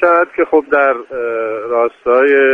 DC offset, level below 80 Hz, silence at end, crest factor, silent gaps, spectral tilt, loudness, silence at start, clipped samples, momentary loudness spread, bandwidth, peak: under 0.1%; -56 dBFS; 0 s; 12 dB; none; -6 dB/octave; -14 LUFS; 0 s; under 0.1%; 9 LU; 4.4 kHz; 0 dBFS